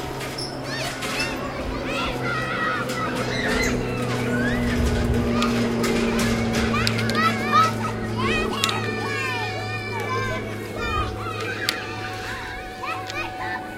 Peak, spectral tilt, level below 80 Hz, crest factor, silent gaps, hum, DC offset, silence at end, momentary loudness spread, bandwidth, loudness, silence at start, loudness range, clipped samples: 0 dBFS; -4.5 dB/octave; -36 dBFS; 24 dB; none; none; under 0.1%; 0 s; 8 LU; 16.5 kHz; -24 LUFS; 0 s; 6 LU; under 0.1%